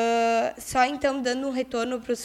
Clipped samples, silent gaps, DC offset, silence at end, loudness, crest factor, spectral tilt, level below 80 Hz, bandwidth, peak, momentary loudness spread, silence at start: under 0.1%; none; under 0.1%; 0 s; -25 LUFS; 18 dB; -3 dB/octave; -56 dBFS; 15.5 kHz; -8 dBFS; 6 LU; 0 s